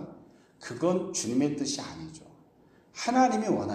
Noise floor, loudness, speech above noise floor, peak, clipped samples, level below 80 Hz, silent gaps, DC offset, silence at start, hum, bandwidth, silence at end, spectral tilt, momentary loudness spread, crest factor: -60 dBFS; -28 LUFS; 32 dB; -12 dBFS; under 0.1%; -66 dBFS; none; under 0.1%; 0 s; none; 13 kHz; 0 s; -4.5 dB/octave; 21 LU; 18 dB